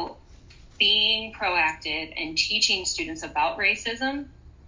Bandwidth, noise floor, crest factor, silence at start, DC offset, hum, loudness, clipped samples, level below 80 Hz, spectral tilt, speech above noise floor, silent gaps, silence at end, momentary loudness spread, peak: 7.6 kHz; -49 dBFS; 20 dB; 0 s; under 0.1%; none; -23 LUFS; under 0.1%; -50 dBFS; -1 dB/octave; 24 dB; none; 0 s; 10 LU; -6 dBFS